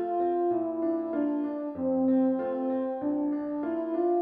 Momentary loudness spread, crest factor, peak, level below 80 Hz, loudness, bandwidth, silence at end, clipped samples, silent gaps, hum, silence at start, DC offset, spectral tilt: 6 LU; 10 dB; -18 dBFS; -70 dBFS; -29 LUFS; 3.7 kHz; 0 s; under 0.1%; none; none; 0 s; under 0.1%; -10.5 dB/octave